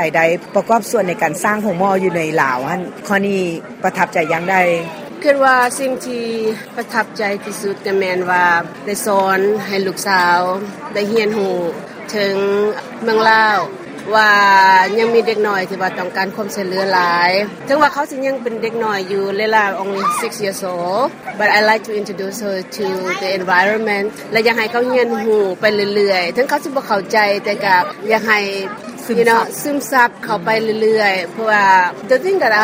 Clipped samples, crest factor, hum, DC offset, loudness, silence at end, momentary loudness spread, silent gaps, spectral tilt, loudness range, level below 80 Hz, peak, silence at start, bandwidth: under 0.1%; 16 dB; none; under 0.1%; -15 LUFS; 0 s; 10 LU; none; -4 dB/octave; 4 LU; -62 dBFS; 0 dBFS; 0 s; 16 kHz